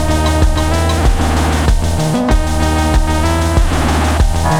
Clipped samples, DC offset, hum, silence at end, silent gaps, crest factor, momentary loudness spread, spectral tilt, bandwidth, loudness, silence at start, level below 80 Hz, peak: under 0.1%; under 0.1%; none; 0 s; none; 12 dB; 1 LU; -5.5 dB/octave; 16 kHz; -14 LUFS; 0 s; -14 dBFS; 0 dBFS